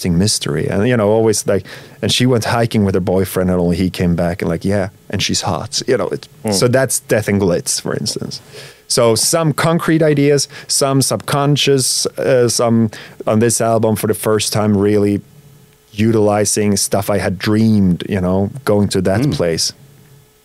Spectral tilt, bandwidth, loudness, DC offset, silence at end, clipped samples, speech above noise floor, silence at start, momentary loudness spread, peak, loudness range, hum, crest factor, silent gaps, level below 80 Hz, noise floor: -4.5 dB/octave; 16 kHz; -15 LUFS; under 0.1%; 0.7 s; under 0.1%; 31 dB; 0 s; 7 LU; -2 dBFS; 3 LU; none; 14 dB; none; -46 dBFS; -45 dBFS